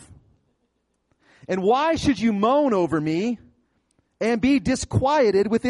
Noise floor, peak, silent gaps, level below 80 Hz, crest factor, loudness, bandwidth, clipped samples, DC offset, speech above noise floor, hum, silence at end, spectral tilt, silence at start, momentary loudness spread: -72 dBFS; -8 dBFS; none; -50 dBFS; 14 dB; -21 LUFS; 11.5 kHz; under 0.1%; under 0.1%; 51 dB; none; 0 s; -6 dB/octave; 0.1 s; 8 LU